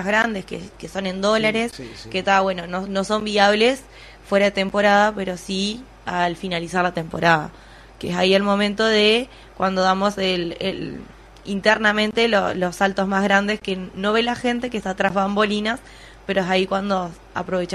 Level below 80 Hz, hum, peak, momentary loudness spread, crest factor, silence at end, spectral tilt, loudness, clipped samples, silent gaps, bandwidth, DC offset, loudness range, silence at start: -48 dBFS; none; -2 dBFS; 13 LU; 18 dB; 0 s; -4.5 dB/octave; -20 LUFS; under 0.1%; none; 13.5 kHz; under 0.1%; 3 LU; 0 s